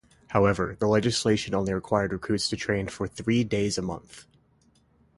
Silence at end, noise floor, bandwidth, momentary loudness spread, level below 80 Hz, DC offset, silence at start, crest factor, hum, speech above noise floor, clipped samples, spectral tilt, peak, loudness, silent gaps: 0.95 s; -63 dBFS; 11.5 kHz; 8 LU; -50 dBFS; under 0.1%; 0.3 s; 20 dB; none; 37 dB; under 0.1%; -5 dB/octave; -6 dBFS; -26 LUFS; none